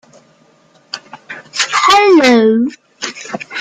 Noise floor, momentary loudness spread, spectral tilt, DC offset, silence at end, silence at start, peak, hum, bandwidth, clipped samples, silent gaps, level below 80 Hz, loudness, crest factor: -50 dBFS; 21 LU; -3 dB/octave; under 0.1%; 0 s; 0.95 s; 0 dBFS; none; 14.5 kHz; under 0.1%; none; -54 dBFS; -11 LUFS; 14 dB